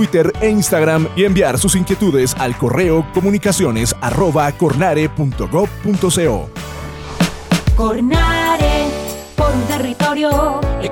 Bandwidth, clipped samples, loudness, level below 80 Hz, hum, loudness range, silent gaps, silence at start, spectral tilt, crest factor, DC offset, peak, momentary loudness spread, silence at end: over 20 kHz; under 0.1%; -15 LUFS; -26 dBFS; none; 3 LU; none; 0 s; -5 dB/octave; 12 dB; under 0.1%; -4 dBFS; 6 LU; 0 s